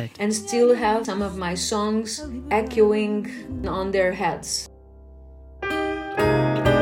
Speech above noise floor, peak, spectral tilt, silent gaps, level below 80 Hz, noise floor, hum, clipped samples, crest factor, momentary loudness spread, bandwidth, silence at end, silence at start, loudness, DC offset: 23 dB; -6 dBFS; -5 dB/octave; none; -44 dBFS; -45 dBFS; none; under 0.1%; 16 dB; 10 LU; 17 kHz; 0 s; 0 s; -23 LUFS; under 0.1%